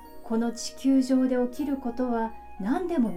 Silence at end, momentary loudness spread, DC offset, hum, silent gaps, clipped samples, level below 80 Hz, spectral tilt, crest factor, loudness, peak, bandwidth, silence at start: 0 s; 8 LU; under 0.1%; none; none; under 0.1%; -54 dBFS; -5.5 dB/octave; 14 dB; -27 LUFS; -14 dBFS; 14.5 kHz; 0 s